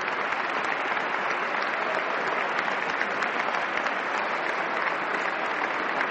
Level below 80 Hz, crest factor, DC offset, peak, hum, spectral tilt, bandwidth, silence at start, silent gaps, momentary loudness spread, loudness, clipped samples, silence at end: -72 dBFS; 18 dB; under 0.1%; -10 dBFS; none; -3 dB/octave; 8.4 kHz; 0 s; none; 1 LU; -27 LUFS; under 0.1%; 0 s